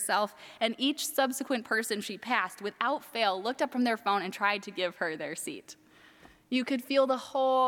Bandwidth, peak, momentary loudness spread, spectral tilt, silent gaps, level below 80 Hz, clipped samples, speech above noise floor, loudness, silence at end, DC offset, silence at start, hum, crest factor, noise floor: 18.5 kHz; -10 dBFS; 8 LU; -2.5 dB/octave; none; -80 dBFS; under 0.1%; 27 dB; -30 LUFS; 0 s; under 0.1%; 0 s; none; 20 dB; -57 dBFS